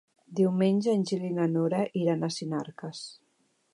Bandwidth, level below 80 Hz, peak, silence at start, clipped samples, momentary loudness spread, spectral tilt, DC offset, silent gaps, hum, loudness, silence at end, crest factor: 11.5 kHz; -78 dBFS; -14 dBFS; 0.3 s; under 0.1%; 15 LU; -7 dB/octave; under 0.1%; none; none; -28 LUFS; 0.6 s; 14 dB